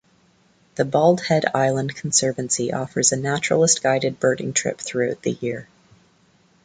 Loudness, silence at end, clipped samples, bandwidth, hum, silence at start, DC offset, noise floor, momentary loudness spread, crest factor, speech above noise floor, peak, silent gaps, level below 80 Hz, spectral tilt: -20 LUFS; 1 s; under 0.1%; 9.6 kHz; none; 0.75 s; under 0.1%; -59 dBFS; 8 LU; 20 dB; 38 dB; -2 dBFS; none; -60 dBFS; -3.5 dB/octave